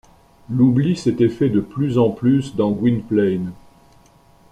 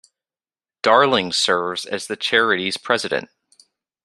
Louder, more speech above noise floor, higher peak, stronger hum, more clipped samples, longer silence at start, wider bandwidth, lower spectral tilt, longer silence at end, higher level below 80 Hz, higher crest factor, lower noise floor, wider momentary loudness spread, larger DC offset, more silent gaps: about the same, -18 LUFS vs -19 LUFS; second, 34 dB vs over 71 dB; about the same, -4 dBFS vs -2 dBFS; neither; neither; second, 0.5 s vs 0.85 s; second, 10 kHz vs 13.5 kHz; first, -8.5 dB/octave vs -2.5 dB/octave; first, 0.95 s vs 0.8 s; first, -50 dBFS vs -64 dBFS; about the same, 16 dB vs 20 dB; second, -51 dBFS vs under -90 dBFS; second, 5 LU vs 10 LU; neither; neither